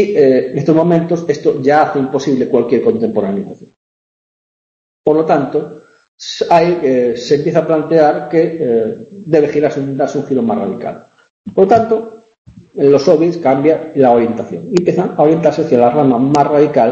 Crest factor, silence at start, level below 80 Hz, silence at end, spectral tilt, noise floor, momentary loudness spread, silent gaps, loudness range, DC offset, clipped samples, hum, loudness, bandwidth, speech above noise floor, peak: 12 dB; 0 s; -54 dBFS; 0 s; -7 dB/octave; under -90 dBFS; 10 LU; 3.76-5.04 s, 6.08-6.18 s, 11.30-11.44 s, 12.38-12.45 s; 5 LU; under 0.1%; under 0.1%; none; -13 LUFS; 7.8 kHz; over 78 dB; 0 dBFS